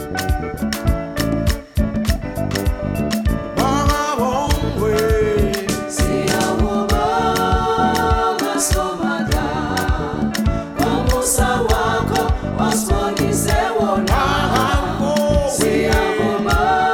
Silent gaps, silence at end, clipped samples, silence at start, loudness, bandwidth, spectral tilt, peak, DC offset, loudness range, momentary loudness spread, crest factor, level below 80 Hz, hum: none; 0 s; under 0.1%; 0 s; -18 LUFS; 19 kHz; -5 dB/octave; -2 dBFS; under 0.1%; 3 LU; 5 LU; 14 dB; -24 dBFS; none